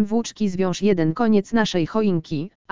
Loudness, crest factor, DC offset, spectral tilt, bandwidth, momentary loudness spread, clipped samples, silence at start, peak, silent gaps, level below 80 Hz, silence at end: -21 LUFS; 16 dB; 2%; -6 dB/octave; 7.6 kHz; 6 LU; under 0.1%; 0 s; -4 dBFS; 2.55-2.65 s; -52 dBFS; 0 s